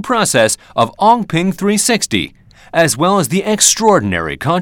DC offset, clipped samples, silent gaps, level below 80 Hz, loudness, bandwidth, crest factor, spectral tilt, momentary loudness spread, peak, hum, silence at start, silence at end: under 0.1%; under 0.1%; none; -48 dBFS; -13 LUFS; over 20 kHz; 14 dB; -3.5 dB/octave; 8 LU; 0 dBFS; none; 0 s; 0 s